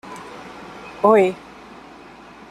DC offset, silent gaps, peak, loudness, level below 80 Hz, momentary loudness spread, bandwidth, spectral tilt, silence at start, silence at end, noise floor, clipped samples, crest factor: under 0.1%; none; -2 dBFS; -17 LUFS; -60 dBFS; 27 LU; 13.5 kHz; -6.5 dB/octave; 0.05 s; 1.15 s; -42 dBFS; under 0.1%; 20 dB